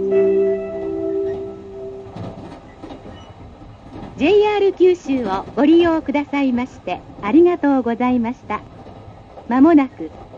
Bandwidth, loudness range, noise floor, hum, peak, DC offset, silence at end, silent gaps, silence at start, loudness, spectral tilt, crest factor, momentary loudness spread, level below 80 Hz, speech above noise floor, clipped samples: 7.4 kHz; 11 LU; -39 dBFS; none; -2 dBFS; under 0.1%; 0 s; none; 0 s; -17 LUFS; -7 dB/octave; 16 dB; 23 LU; -48 dBFS; 23 dB; under 0.1%